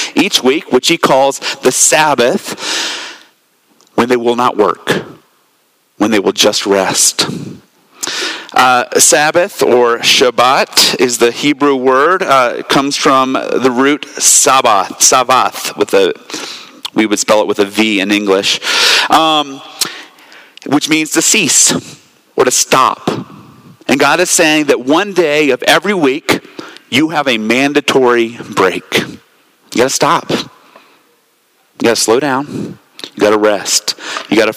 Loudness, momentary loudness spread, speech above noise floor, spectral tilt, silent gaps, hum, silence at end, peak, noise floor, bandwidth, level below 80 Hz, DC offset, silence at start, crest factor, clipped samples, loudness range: -11 LUFS; 12 LU; 44 dB; -2 dB/octave; none; none; 0 s; 0 dBFS; -56 dBFS; over 20 kHz; -56 dBFS; under 0.1%; 0 s; 12 dB; 0.1%; 6 LU